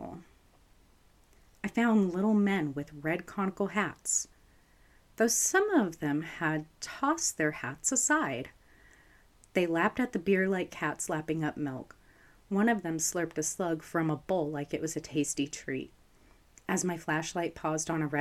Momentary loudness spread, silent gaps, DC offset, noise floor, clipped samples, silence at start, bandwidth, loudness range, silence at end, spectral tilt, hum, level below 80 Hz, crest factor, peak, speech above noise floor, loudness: 11 LU; none; under 0.1%; -62 dBFS; under 0.1%; 0 s; 15 kHz; 4 LU; 0 s; -4 dB/octave; none; -62 dBFS; 20 dB; -12 dBFS; 32 dB; -31 LUFS